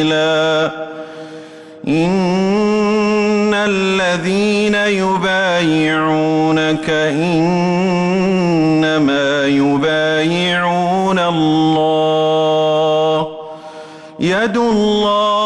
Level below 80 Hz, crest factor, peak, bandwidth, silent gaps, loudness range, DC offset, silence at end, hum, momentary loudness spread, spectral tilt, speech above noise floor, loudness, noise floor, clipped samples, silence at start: -50 dBFS; 8 dB; -6 dBFS; 11.5 kHz; none; 2 LU; under 0.1%; 0 s; none; 7 LU; -5.5 dB/octave; 20 dB; -14 LUFS; -34 dBFS; under 0.1%; 0 s